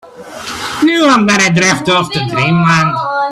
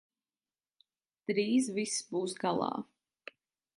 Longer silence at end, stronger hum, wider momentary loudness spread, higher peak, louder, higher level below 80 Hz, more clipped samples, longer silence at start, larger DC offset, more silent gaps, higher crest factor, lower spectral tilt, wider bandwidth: second, 0 s vs 0.95 s; neither; second, 13 LU vs 22 LU; first, 0 dBFS vs -16 dBFS; first, -11 LUFS vs -33 LUFS; first, -46 dBFS vs -80 dBFS; neither; second, 0.05 s vs 1.3 s; neither; neither; second, 12 dB vs 20 dB; about the same, -4.5 dB/octave vs -4 dB/octave; first, 13.5 kHz vs 11.5 kHz